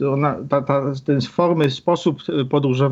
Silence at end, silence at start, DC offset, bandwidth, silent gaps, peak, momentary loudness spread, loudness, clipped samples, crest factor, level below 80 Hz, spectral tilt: 0 s; 0 s; under 0.1%; 7.8 kHz; none; -2 dBFS; 4 LU; -20 LUFS; under 0.1%; 16 dB; -60 dBFS; -7.5 dB/octave